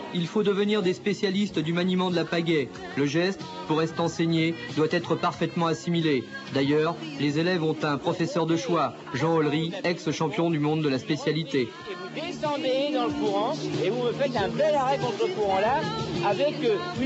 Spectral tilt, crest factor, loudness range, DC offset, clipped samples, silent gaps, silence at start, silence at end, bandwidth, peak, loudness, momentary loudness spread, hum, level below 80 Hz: -6 dB/octave; 14 dB; 2 LU; under 0.1%; under 0.1%; none; 0 s; 0 s; 8.2 kHz; -12 dBFS; -26 LUFS; 5 LU; none; -62 dBFS